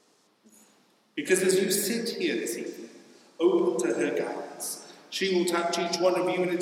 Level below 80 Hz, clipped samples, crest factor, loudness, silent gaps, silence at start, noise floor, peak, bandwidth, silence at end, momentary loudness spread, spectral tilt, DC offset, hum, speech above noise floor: -88 dBFS; under 0.1%; 18 dB; -27 LUFS; none; 1.15 s; -64 dBFS; -10 dBFS; 17 kHz; 0 s; 12 LU; -3.5 dB/octave; under 0.1%; none; 37 dB